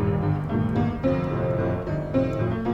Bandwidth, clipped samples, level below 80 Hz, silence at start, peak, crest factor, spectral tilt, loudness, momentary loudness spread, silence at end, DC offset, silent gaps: 7.4 kHz; under 0.1%; -40 dBFS; 0 s; -10 dBFS; 14 dB; -10 dB/octave; -25 LUFS; 2 LU; 0 s; under 0.1%; none